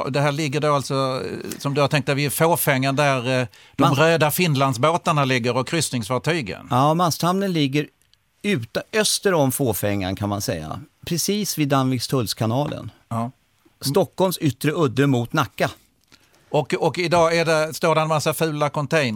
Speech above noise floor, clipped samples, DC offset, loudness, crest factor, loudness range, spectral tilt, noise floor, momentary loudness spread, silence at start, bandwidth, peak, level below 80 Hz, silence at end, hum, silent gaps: 41 dB; under 0.1%; under 0.1%; -21 LUFS; 18 dB; 4 LU; -5 dB/octave; -62 dBFS; 9 LU; 0 s; 17.5 kHz; -4 dBFS; -56 dBFS; 0 s; none; none